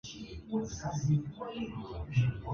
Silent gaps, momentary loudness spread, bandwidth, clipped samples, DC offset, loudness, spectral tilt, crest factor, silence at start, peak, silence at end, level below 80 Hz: none; 10 LU; 7.2 kHz; under 0.1%; under 0.1%; -35 LUFS; -6.5 dB/octave; 16 dB; 0.05 s; -18 dBFS; 0 s; -50 dBFS